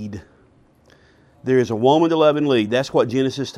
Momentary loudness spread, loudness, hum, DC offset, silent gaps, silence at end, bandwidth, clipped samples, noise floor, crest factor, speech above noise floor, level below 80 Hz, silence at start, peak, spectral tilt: 14 LU; -18 LUFS; none; under 0.1%; none; 0 s; 11.5 kHz; under 0.1%; -54 dBFS; 16 dB; 36 dB; -58 dBFS; 0 s; -2 dBFS; -6 dB/octave